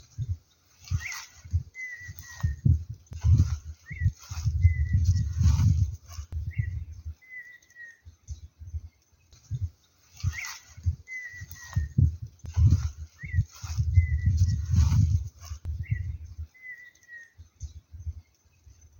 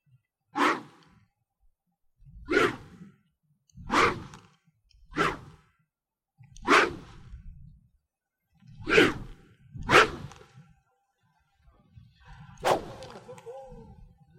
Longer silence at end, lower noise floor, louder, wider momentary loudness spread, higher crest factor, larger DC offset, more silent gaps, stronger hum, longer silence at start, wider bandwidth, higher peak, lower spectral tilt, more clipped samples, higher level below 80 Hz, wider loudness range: first, 0.8 s vs 0.55 s; second, -60 dBFS vs -89 dBFS; second, -29 LUFS vs -25 LUFS; second, 20 LU vs 24 LU; second, 20 dB vs 28 dB; neither; neither; neither; second, 0.2 s vs 0.55 s; about the same, 17 kHz vs 16 kHz; second, -8 dBFS vs -4 dBFS; first, -6 dB/octave vs -4 dB/octave; neither; first, -34 dBFS vs -52 dBFS; first, 13 LU vs 10 LU